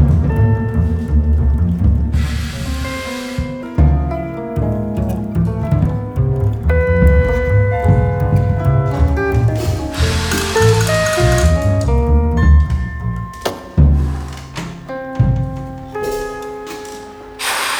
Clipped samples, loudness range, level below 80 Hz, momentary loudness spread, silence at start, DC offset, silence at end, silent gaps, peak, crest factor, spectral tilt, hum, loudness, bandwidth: under 0.1%; 5 LU; -20 dBFS; 13 LU; 0 s; under 0.1%; 0 s; none; -2 dBFS; 14 dB; -6 dB/octave; none; -16 LUFS; 17.5 kHz